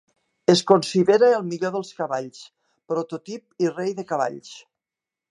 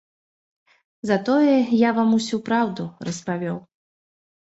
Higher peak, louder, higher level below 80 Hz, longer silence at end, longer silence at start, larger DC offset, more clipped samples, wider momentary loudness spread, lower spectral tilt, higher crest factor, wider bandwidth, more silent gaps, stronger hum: first, -2 dBFS vs -6 dBFS; about the same, -22 LUFS vs -21 LUFS; second, -72 dBFS vs -66 dBFS; second, 0.7 s vs 0.9 s; second, 0.5 s vs 1.05 s; neither; neither; first, 17 LU vs 13 LU; about the same, -5 dB/octave vs -6 dB/octave; about the same, 22 dB vs 18 dB; first, 11.5 kHz vs 8 kHz; neither; neither